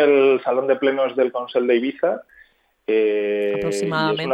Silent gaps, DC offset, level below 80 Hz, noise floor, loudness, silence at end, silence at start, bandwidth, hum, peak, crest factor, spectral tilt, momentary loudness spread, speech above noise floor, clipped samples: none; under 0.1%; -60 dBFS; -55 dBFS; -20 LUFS; 0 s; 0 s; 10.5 kHz; none; -4 dBFS; 14 dB; -5.5 dB/octave; 6 LU; 36 dB; under 0.1%